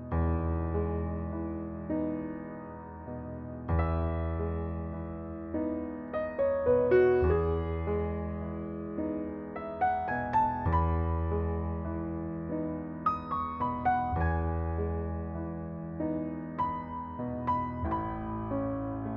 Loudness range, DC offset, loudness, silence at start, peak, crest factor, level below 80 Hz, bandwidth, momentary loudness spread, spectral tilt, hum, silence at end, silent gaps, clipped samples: 6 LU; under 0.1%; -32 LUFS; 0 s; -14 dBFS; 16 dB; -42 dBFS; 4.3 kHz; 11 LU; -11 dB/octave; none; 0 s; none; under 0.1%